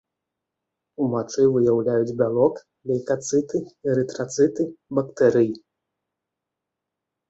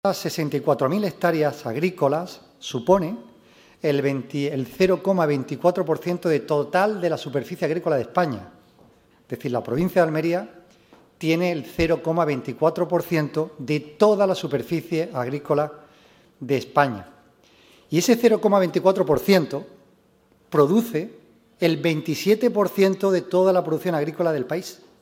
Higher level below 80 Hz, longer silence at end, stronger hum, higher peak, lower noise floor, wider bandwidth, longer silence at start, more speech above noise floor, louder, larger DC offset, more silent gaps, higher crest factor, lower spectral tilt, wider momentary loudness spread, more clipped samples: second, -62 dBFS vs -56 dBFS; first, 1.7 s vs 0.3 s; neither; about the same, -4 dBFS vs -2 dBFS; first, -84 dBFS vs -59 dBFS; second, 8.2 kHz vs 16 kHz; first, 1 s vs 0.05 s; first, 63 dB vs 38 dB; about the same, -22 LUFS vs -22 LUFS; neither; neither; about the same, 18 dB vs 20 dB; about the same, -6.5 dB/octave vs -6 dB/octave; about the same, 9 LU vs 9 LU; neither